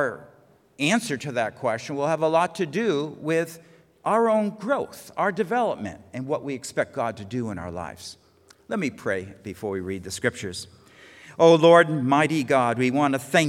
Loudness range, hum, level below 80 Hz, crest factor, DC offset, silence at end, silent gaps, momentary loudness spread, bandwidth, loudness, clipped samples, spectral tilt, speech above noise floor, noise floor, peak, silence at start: 10 LU; none; -68 dBFS; 22 dB; under 0.1%; 0 s; none; 15 LU; 16 kHz; -24 LUFS; under 0.1%; -5 dB/octave; 33 dB; -56 dBFS; -2 dBFS; 0 s